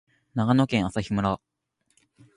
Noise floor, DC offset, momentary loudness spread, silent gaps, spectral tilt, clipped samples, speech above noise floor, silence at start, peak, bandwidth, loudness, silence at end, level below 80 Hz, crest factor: -70 dBFS; under 0.1%; 11 LU; none; -7 dB/octave; under 0.1%; 46 dB; 0.35 s; -8 dBFS; 11 kHz; -25 LUFS; 1 s; -50 dBFS; 18 dB